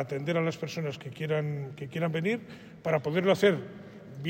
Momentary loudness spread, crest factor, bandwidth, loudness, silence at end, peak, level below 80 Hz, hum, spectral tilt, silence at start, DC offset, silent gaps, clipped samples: 14 LU; 18 dB; 16 kHz; -30 LUFS; 0 s; -12 dBFS; -70 dBFS; none; -6.5 dB/octave; 0 s; under 0.1%; none; under 0.1%